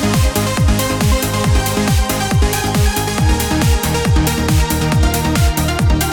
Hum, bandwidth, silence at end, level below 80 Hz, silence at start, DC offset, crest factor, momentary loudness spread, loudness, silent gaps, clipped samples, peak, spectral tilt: none; 19.5 kHz; 0 s; -18 dBFS; 0 s; under 0.1%; 12 dB; 1 LU; -15 LUFS; none; under 0.1%; -2 dBFS; -5 dB/octave